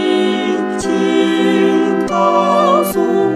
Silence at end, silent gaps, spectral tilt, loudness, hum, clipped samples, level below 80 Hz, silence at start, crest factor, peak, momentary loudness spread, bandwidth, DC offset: 0 s; none; -5.5 dB/octave; -14 LUFS; none; under 0.1%; -50 dBFS; 0 s; 12 dB; 0 dBFS; 5 LU; 14 kHz; under 0.1%